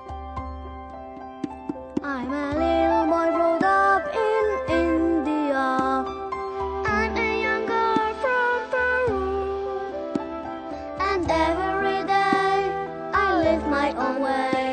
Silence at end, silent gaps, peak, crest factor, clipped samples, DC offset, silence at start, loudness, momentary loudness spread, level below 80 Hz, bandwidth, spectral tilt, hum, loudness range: 0 s; none; -6 dBFS; 18 dB; under 0.1%; under 0.1%; 0 s; -23 LUFS; 13 LU; -42 dBFS; 9.2 kHz; -6 dB/octave; none; 4 LU